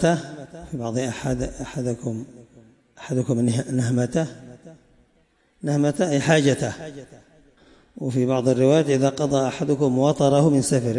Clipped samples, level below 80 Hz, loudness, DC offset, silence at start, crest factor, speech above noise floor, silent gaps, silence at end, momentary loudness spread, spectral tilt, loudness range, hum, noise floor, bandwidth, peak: under 0.1%; -50 dBFS; -22 LUFS; under 0.1%; 0 s; 16 dB; 41 dB; none; 0 s; 17 LU; -6 dB/octave; 6 LU; none; -63 dBFS; 11.5 kHz; -6 dBFS